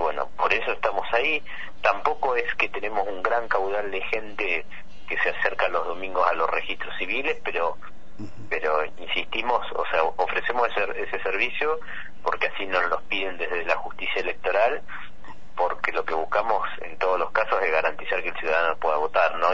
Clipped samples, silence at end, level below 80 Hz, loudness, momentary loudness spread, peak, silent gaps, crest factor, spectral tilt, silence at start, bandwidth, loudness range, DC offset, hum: under 0.1%; 0 s; -52 dBFS; -25 LUFS; 7 LU; -6 dBFS; none; 20 dB; -4 dB/octave; 0 s; 7.6 kHz; 2 LU; 4%; none